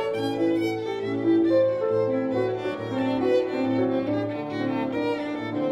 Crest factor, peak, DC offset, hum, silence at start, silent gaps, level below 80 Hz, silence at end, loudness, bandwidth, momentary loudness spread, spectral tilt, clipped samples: 14 dB; -10 dBFS; under 0.1%; none; 0 s; none; -62 dBFS; 0 s; -25 LUFS; 11 kHz; 7 LU; -7.5 dB/octave; under 0.1%